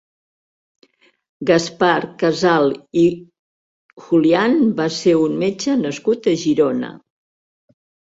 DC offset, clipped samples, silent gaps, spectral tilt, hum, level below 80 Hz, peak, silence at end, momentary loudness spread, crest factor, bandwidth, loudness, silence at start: under 0.1%; under 0.1%; 3.39-3.89 s; -5.5 dB/octave; none; -60 dBFS; -2 dBFS; 1.25 s; 5 LU; 18 dB; 8 kHz; -17 LUFS; 1.4 s